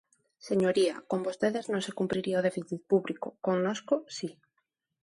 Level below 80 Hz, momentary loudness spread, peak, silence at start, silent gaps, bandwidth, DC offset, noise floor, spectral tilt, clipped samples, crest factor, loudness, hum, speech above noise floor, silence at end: -72 dBFS; 10 LU; -12 dBFS; 0.45 s; none; 11.5 kHz; under 0.1%; -80 dBFS; -5.5 dB/octave; under 0.1%; 18 dB; -30 LUFS; none; 50 dB; 0.7 s